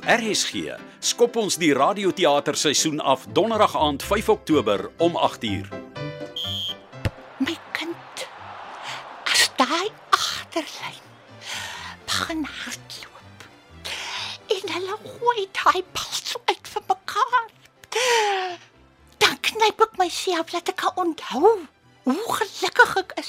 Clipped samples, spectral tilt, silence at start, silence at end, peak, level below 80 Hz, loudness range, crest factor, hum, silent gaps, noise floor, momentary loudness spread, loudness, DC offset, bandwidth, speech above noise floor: under 0.1%; -2.5 dB/octave; 0 s; 0 s; -4 dBFS; -54 dBFS; 9 LU; 20 dB; none; none; -53 dBFS; 14 LU; -23 LUFS; under 0.1%; 16 kHz; 32 dB